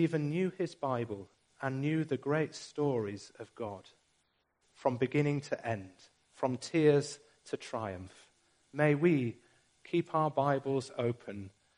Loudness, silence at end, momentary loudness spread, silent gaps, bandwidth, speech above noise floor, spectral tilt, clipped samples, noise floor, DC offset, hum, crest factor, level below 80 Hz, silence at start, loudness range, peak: -34 LUFS; 0.3 s; 17 LU; none; 10.5 kHz; 44 dB; -7 dB/octave; under 0.1%; -77 dBFS; under 0.1%; none; 20 dB; -74 dBFS; 0 s; 4 LU; -14 dBFS